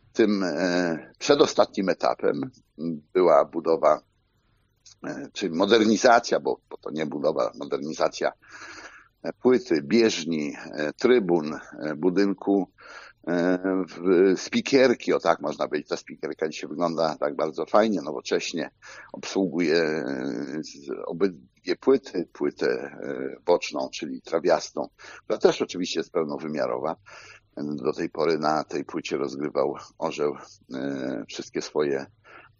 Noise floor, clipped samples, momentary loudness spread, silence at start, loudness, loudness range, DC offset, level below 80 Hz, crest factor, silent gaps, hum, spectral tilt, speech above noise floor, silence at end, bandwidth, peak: -67 dBFS; under 0.1%; 15 LU; 0.15 s; -25 LUFS; 5 LU; under 0.1%; -68 dBFS; 22 dB; none; none; -4 dB/octave; 42 dB; 0.2 s; 7.4 kHz; -2 dBFS